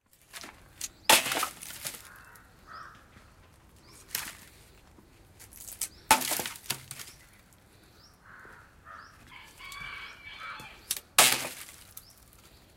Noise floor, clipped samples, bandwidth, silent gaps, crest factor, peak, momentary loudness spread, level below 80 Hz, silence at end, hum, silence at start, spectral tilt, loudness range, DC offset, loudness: -58 dBFS; under 0.1%; 17 kHz; none; 30 dB; -4 dBFS; 28 LU; -62 dBFS; 0.75 s; none; 0.35 s; 0 dB/octave; 15 LU; under 0.1%; -28 LUFS